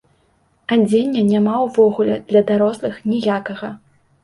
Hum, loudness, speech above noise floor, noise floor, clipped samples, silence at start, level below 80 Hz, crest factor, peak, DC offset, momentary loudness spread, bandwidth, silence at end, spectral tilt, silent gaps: none; -17 LUFS; 43 dB; -60 dBFS; under 0.1%; 0.7 s; -58 dBFS; 16 dB; -2 dBFS; under 0.1%; 12 LU; 11.5 kHz; 0.5 s; -7 dB/octave; none